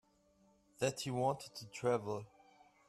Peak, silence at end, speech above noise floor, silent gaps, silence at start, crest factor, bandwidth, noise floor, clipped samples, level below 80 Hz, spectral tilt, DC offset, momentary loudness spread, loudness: -22 dBFS; 0.65 s; 33 dB; none; 0.8 s; 20 dB; 13.5 kHz; -72 dBFS; under 0.1%; -76 dBFS; -5 dB/octave; under 0.1%; 10 LU; -39 LUFS